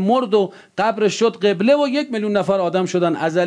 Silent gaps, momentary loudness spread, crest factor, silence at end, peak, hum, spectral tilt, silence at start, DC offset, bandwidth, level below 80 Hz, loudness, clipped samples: none; 5 LU; 12 dB; 0 s; -4 dBFS; none; -5.5 dB/octave; 0 s; under 0.1%; 10.5 kHz; -68 dBFS; -18 LUFS; under 0.1%